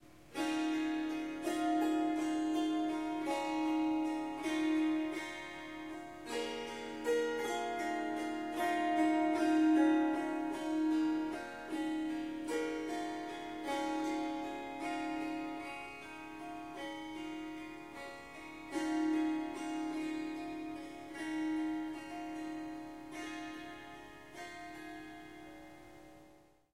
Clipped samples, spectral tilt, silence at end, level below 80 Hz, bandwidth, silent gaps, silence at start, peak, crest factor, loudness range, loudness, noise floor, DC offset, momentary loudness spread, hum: under 0.1%; -4 dB/octave; 0.35 s; -70 dBFS; 13.5 kHz; none; 0 s; -20 dBFS; 18 dB; 12 LU; -37 LUFS; -63 dBFS; under 0.1%; 15 LU; none